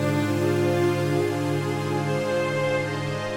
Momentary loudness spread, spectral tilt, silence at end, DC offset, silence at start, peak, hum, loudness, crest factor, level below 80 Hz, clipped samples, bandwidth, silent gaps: 4 LU; -6.5 dB/octave; 0 s; under 0.1%; 0 s; -12 dBFS; none; -24 LUFS; 12 dB; -58 dBFS; under 0.1%; 17.5 kHz; none